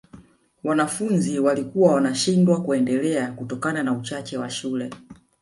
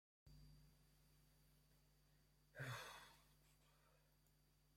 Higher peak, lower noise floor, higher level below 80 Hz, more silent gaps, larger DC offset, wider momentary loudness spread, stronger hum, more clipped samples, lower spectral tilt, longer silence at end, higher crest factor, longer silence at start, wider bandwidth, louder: first, -4 dBFS vs -40 dBFS; second, -49 dBFS vs -78 dBFS; first, -62 dBFS vs -78 dBFS; neither; neither; second, 11 LU vs 16 LU; neither; neither; first, -5.5 dB/octave vs -4 dB/octave; first, 0.3 s vs 0 s; second, 18 dB vs 24 dB; about the same, 0.15 s vs 0.25 s; second, 11.5 kHz vs 16 kHz; first, -22 LUFS vs -56 LUFS